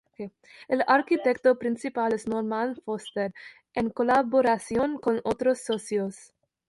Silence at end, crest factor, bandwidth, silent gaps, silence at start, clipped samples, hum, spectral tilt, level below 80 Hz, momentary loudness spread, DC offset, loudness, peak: 0.45 s; 18 dB; 11.5 kHz; none; 0.2 s; under 0.1%; none; -5 dB/octave; -62 dBFS; 12 LU; under 0.1%; -26 LUFS; -8 dBFS